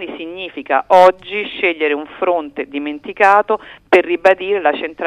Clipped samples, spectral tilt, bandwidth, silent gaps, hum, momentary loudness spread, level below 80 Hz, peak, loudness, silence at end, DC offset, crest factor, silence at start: 0.2%; -4.5 dB/octave; 11 kHz; none; none; 15 LU; -56 dBFS; 0 dBFS; -15 LUFS; 0 s; under 0.1%; 16 dB; 0 s